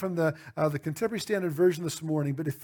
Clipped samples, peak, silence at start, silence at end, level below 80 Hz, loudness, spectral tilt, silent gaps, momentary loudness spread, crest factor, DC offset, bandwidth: under 0.1%; -12 dBFS; 0 s; 0 s; -68 dBFS; -29 LUFS; -6 dB/octave; none; 6 LU; 16 dB; under 0.1%; over 20 kHz